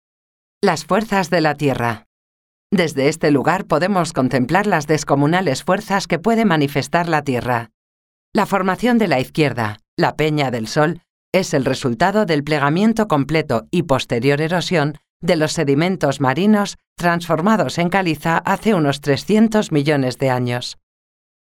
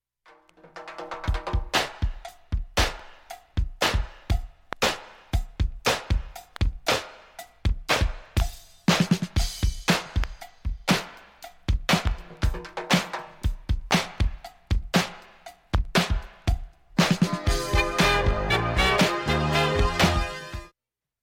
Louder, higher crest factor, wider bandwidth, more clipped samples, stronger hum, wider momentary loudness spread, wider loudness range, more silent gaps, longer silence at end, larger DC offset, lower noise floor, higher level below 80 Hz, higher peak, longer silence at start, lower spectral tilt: first, -18 LUFS vs -26 LUFS; about the same, 16 dB vs 18 dB; about the same, 17 kHz vs 17 kHz; neither; neither; second, 5 LU vs 16 LU; second, 2 LU vs 6 LU; first, 2.06-2.70 s, 7.74-8.32 s, 9.88-9.97 s, 11.10-11.32 s, 15.10-15.20 s, 16.87-16.96 s vs none; first, 0.8 s vs 0.55 s; neither; about the same, under -90 dBFS vs -88 dBFS; second, -48 dBFS vs -30 dBFS; first, -2 dBFS vs -8 dBFS; about the same, 0.65 s vs 0.75 s; about the same, -5.5 dB/octave vs -4.5 dB/octave